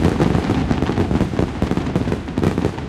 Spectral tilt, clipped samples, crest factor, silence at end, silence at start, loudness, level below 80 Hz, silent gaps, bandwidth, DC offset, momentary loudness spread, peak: -7.5 dB/octave; under 0.1%; 16 dB; 0 s; 0 s; -20 LUFS; -30 dBFS; none; 14 kHz; under 0.1%; 4 LU; -4 dBFS